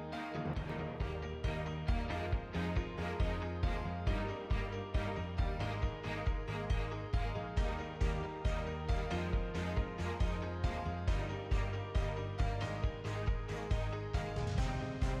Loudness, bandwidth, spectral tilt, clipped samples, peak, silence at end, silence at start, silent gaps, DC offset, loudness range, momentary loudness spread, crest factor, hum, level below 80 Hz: -38 LUFS; 9.4 kHz; -6.5 dB/octave; under 0.1%; -24 dBFS; 0 s; 0 s; none; under 0.1%; 1 LU; 3 LU; 12 dB; none; -40 dBFS